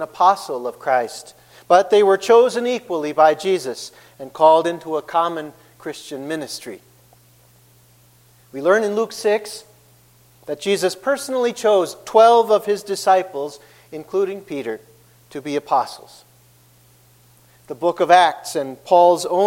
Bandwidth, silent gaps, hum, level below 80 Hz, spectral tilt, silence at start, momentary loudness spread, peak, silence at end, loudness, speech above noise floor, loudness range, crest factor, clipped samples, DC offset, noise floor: 16.5 kHz; none; none; -68 dBFS; -3.5 dB/octave; 0 s; 20 LU; 0 dBFS; 0 s; -18 LUFS; 35 dB; 10 LU; 18 dB; under 0.1%; under 0.1%; -53 dBFS